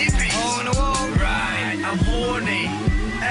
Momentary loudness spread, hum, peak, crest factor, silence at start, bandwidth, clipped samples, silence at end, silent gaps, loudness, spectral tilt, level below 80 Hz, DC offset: 3 LU; none; -8 dBFS; 12 dB; 0 s; 11 kHz; under 0.1%; 0 s; none; -21 LUFS; -4 dB/octave; -26 dBFS; under 0.1%